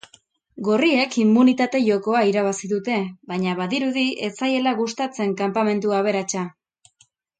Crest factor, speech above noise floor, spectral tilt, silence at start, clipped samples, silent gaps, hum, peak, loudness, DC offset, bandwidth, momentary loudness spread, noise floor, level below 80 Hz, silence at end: 16 dB; 41 dB; -5 dB/octave; 0.55 s; under 0.1%; none; none; -6 dBFS; -21 LUFS; under 0.1%; 9.2 kHz; 8 LU; -61 dBFS; -70 dBFS; 0.9 s